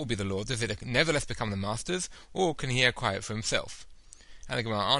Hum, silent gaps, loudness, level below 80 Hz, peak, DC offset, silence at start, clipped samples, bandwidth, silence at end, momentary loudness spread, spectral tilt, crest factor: none; none; -30 LUFS; -50 dBFS; -8 dBFS; under 0.1%; 0 s; under 0.1%; 11.5 kHz; 0 s; 8 LU; -3.5 dB/octave; 22 dB